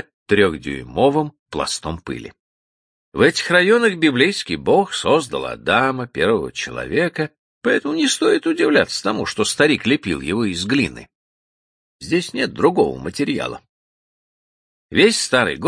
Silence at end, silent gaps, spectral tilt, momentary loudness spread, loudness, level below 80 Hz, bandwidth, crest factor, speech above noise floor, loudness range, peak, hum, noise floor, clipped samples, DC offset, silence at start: 0 s; 1.39-1.46 s, 2.39-3.12 s, 7.39-7.61 s, 11.15-11.99 s, 13.69-14.89 s; -4 dB/octave; 11 LU; -18 LUFS; -48 dBFS; 10.5 kHz; 18 dB; over 72 dB; 5 LU; 0 dBFS; none; under -90 dBFS; under 0.1%; under 0.1%; 0.3 s